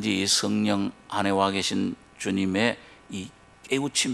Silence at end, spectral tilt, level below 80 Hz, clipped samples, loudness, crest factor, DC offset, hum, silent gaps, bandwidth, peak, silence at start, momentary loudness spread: 0 s; -3.5 dB/octave; -64 dBFS; under 0.1%; -25 LUFS; 20 dB; under 0.1%; none; none; 13 kHz; -6 dBFS; 0 s; 15 LU